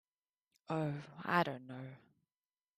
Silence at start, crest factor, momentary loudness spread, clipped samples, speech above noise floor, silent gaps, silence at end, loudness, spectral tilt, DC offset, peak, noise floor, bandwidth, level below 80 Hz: 0.7 s; 24 dB; 15 LU; under 0.1%; over 51 dB; none; 0.8 s; -38 LUFS; -7 dB/octave; under 0.1%; -18 dBFS; under -90 dBFS; 14 kHz; -78 dBFS